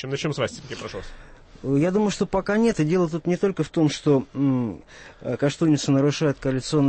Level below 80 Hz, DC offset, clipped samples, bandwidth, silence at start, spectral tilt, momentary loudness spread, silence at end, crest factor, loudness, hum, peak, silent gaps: -48 dBFS; under 0.1%; under 0.1%; 8.8 kHz; 0 s; -6.5 dB/octave; 13 LU; 0 s; 14 dB; -23 LUFS; none; -10 dBFS; none